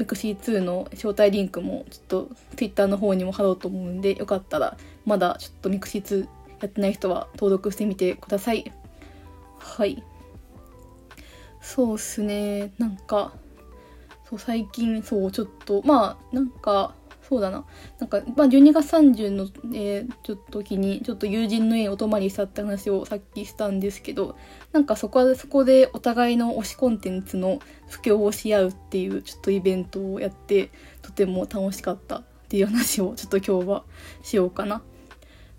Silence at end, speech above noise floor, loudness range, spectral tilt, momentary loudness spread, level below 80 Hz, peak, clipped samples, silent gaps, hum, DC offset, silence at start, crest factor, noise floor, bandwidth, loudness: 0.75 s; 25 dB; 8 LU; -6 dB/octave; 13 LU; -50 dBFS; -4 dBFS; under 0.1%; none; none; under 0.1%; 0 s; 20 dB; -48 dBFS; 16.5 kHz; -24 LUFS